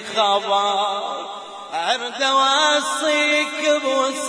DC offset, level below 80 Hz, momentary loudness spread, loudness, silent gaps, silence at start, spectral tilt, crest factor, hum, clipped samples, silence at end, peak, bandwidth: under 0.1%; -74 dBFS; 13 LU; -19 LUFS; none; 0 s; -0.5 dB/octave; 16 dB; none; under 0.1%; 0 s; -4 dBFS; 10.5 kHz